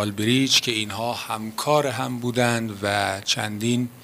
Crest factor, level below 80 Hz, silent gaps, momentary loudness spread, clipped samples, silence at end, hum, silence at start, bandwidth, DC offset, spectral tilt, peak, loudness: 18 dB; -62 dBFS; none; 9 LU; under 0.1%; 0 s; none; 0 s; 16 kHz; under 0.1%; -3.5 dB/octave; -6 dBFS; -23 LUFS